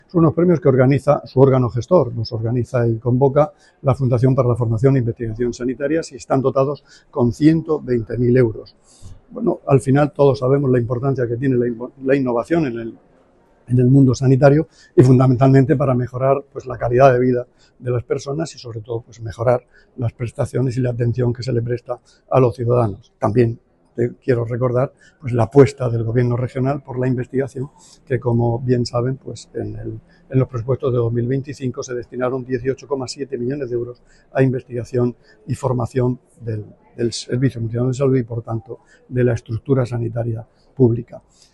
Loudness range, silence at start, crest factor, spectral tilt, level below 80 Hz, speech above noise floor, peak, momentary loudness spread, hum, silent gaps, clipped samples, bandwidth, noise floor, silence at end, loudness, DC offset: 7 LU; 0.15 s; 18 dB; -8.5 dB/octave; -44 dBFS; 36 dB; 0 dBFS; 15 LU; none; none; under 0.1%; 10 kHz; -54 dBFS; 0.35 s; -18 LUFS; under 0.1%